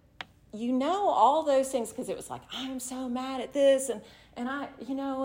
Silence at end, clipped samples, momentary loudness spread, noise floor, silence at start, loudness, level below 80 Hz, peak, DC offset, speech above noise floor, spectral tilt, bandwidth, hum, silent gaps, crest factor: 0 s; under 0.1%; 15 LU; -48 dBFS; 0.2 s; -29 LUFS; -64 dBFS; -10 dBFS; under 0.1%; 20 dB; -3.5 dB/octave; 16 kHz; none; none; 20 dB